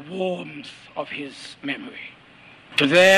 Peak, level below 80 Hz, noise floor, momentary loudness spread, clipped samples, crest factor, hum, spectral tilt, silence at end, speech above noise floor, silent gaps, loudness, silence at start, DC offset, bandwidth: -6 dBFS; -66 dBFS; -49 dBFS; 19 LU; under 0.1%; 16 dB; none; -3.5 dB/octave; 0 s; 27 dB; none; -24 LUFS; 0 s; under 0.1%; 14.5 kHz